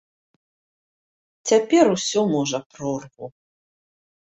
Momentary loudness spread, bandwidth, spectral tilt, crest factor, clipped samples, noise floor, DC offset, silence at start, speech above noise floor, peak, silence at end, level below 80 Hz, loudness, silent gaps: 21 LU; 8.2 kHz; -4.5 dB/octave; 20 dB; under 0.1%; under -90 dBFS; under 0.1%; 1.45 s; over 70 dB; -4 dBFS; 1.05 s; -66 dBFS; -21 LUFS; 2.66-2.70 s